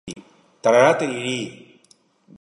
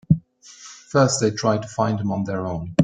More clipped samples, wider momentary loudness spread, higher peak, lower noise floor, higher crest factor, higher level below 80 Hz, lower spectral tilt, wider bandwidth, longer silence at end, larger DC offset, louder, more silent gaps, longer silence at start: neither; first, 22 LU vs 17 LU; about the same, -2 dBFS vs -2 dBFS; first, -58 dBFS vs -46 dBFS; about the same, 20 dB vs 20 dB; second, -66 dBFS vs -50 dBFS; about the same, -4.5 dB/octave vs -5.5 dB/octave; first, 11.5 kHz vs 9.6 kHz; first, 0.9 s vs 0 s; neither; first, -19 LUFS vs -22 LUFS; neither; about the same, 0.05 s vs 0.1 s